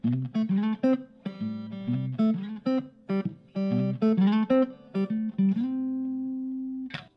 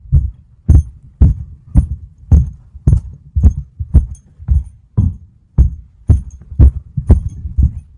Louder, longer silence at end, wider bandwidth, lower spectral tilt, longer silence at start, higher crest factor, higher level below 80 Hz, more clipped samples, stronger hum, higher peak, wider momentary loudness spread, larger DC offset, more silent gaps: second, -28 LUFS vs -16 LUFS; about the same, 0.1 s vs 0.15 s; about the same, 6 kHz vs 6.6 kHz; about the same, -9.5 dB/octave vs -10.5 dB/octave; about the same, 0.05 s vs 0.1 s; about the same, 14 dB vs 14 dB; second, -72 dBFS vs -16 dBFS; neither; neither; second, -12 dBFS vs 0 dBFS; second, 11 LU vs 14 LU; neither; neither